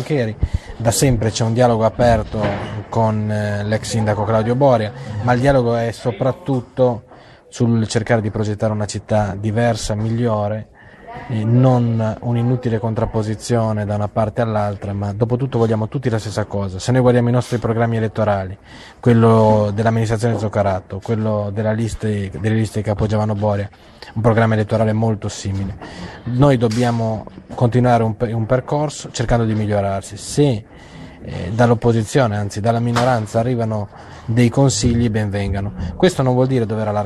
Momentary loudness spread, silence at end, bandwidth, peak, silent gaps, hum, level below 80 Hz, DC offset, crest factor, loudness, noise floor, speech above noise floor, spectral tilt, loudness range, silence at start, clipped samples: 10 LU; 0 s; 13 kHz; 0 dBFS; none; none; -36 dBFS; under 0.1%; 18 dB; -18 LUFS; -37 dBFS; 20 dB; -6.5 dB/octave; 3 LU; 0 s; under 0.1%